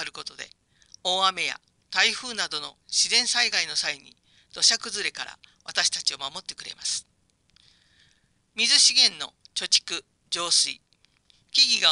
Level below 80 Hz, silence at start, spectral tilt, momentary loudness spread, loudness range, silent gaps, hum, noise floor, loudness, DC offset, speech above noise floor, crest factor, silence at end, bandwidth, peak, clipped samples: -70 dBFS; 0 s; 1.5 dB/octave; 19 LU; 7 LU; none; none; -66 dBFS; -22 LUFS; under 0.1%; 41 dB; 22 dB; 0 s; 11.5 kHz; -4 dBFS; under 0.1%